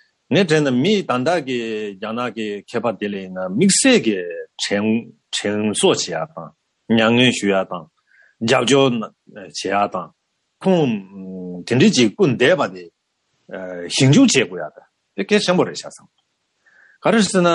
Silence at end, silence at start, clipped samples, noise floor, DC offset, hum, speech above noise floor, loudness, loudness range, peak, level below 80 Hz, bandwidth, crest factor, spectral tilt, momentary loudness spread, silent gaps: 0 s; 0.3 s; under 0.1%; -70 dBFS; under 0.1%; none; 52 dB; -18 LUFS; 3 LU; -2 dBFS; -64 dBFS; 11.5 kHz; 16 dB; -4.5 dB/octave; 17 LU; none